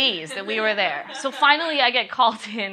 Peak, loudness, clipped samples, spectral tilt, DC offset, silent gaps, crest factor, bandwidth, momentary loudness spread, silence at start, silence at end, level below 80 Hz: -2 dBFS; -21 LUFS; under 0.1%; -2 dB/octave; under 0.1%; none; 20 dB; 13 kHz; 11 LU; 0 s; 0 s; -80 dBFS